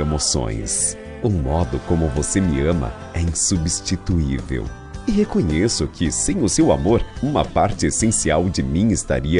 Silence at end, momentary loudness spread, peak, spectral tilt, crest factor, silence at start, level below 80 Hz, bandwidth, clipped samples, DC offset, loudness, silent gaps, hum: 0 s; 6 LU; -4 dBFS; -5 dB/octave; 16 dB; 0 s; -32 dBFS; 11 kHz; under 0.1%; under 0.1%; -20 LUFS; none; none